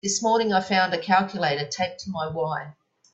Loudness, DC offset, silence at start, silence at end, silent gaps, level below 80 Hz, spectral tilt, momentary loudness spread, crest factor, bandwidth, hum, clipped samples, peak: -24 LUFS; under 0.1%; 0.05 s; 0.4 s; none; -64 dBFS; -3.5 dB/octave; 9 LU; 18 dB; 8.4 kHz; none; under 0.1%; -6 dBFS